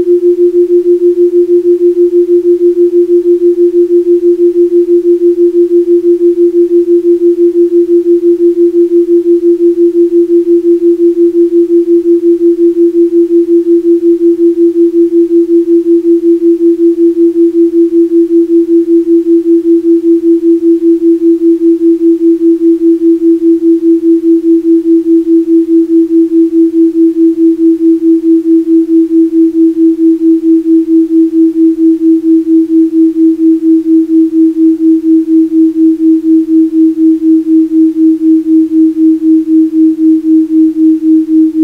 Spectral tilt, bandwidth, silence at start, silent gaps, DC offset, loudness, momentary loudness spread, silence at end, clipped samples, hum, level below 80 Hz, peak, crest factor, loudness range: -8 dB/octave; 0.9 kHz; 0 s; none; under 0.1%; -7 LUFS; 1 LU; 0 s; under 0.1%; none; -50 dBFS; 0 dBFS; 6 dB; 0 LU